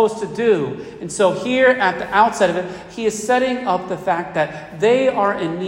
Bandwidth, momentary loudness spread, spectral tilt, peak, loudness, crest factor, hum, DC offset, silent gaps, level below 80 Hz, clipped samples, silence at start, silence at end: 16 kHz; 9 LU; -4.5 dB/octave; -2 dBFS; -18 LUFS; 16 dB; none; under 0.1%; none; -54 dBFS; under 0.1%; 0 s; 0 s